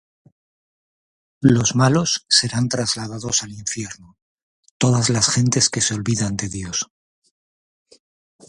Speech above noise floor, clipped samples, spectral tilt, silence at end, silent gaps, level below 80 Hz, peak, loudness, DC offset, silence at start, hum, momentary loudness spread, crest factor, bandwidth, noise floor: over 71 dB; under 0.1%; -3.5 dB/octave; 1.65 s; 4.22-4.63 s, 4.71-4.80 s; -50 dBFS; 0 dBFS; -19 LUFS; under 0.1%; 1.4 s; none; 11 LU; 22 dB; 11.5 kHz; under -90 dBFS